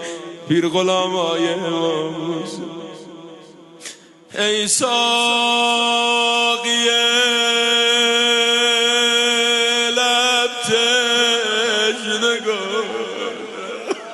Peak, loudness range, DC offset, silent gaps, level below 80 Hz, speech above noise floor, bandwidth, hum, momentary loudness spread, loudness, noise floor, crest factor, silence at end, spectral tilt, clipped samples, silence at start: -4 dBFS; 8 LU; under 0.1%; none; -68 dBFS; 24 dB; 12 kHz; none; 15 LU; -16 LUFS; -41 dBFS; 14 dB; 0 s; -1.5 dB/octave; under 0.1%; 0 s